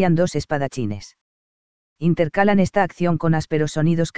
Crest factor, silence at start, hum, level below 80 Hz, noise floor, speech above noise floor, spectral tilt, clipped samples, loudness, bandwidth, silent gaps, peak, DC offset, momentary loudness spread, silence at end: 18 dB; 0 s; none; -48 dBFS; under -90 dBFS; over 71 dB; -7 dB/octave; under 0.1%; -20 LUFS; 8 kHz; 1.21-1.96 s; -2 dBFS; 2%; 8 LU; 0 s